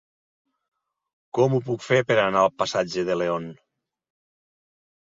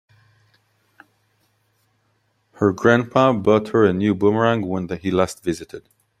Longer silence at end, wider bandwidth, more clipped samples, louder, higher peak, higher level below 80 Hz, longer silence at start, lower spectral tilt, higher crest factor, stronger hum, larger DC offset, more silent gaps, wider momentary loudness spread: first, 1.6 s vs 0.4 s; second, 7.8 kHz vs 13.5 kHz; neither; second, -23 LUFS vs -19 LUFS; second, -6 dBFS vs 0 dBFS; second, -64 dBFS vs -56 dBFS; second, 1.35 s vs 2.6 s; about the same, -5.5 dB/octave vs -6.5 dB/octave; about the same, 20 dB vs 20 dB; neither; neither; neither; about the same, 10 LU vs 11 LU